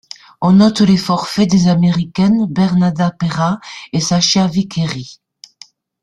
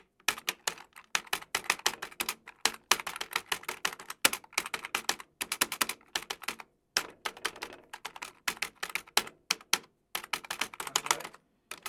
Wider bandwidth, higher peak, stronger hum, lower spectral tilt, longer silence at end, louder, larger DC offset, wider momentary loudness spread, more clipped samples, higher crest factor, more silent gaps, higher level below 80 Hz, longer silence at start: second, 11 kHz vs 19.5 kHz; about the same, -2 dBFS vs -4 dBFS; neither; first, -5.5 dB/octave vs 1 dB/octave; first, 0.9 s vs 0 s; first, -14 LUFS vs -33 LUFS; neither; about the same, 10 LU vs 11 LU; neither; second, 14 dB vs 32 dB; neither; first, -48 dBFS vs -70 dBFS; about the same, 0.4 s vs 0.3 s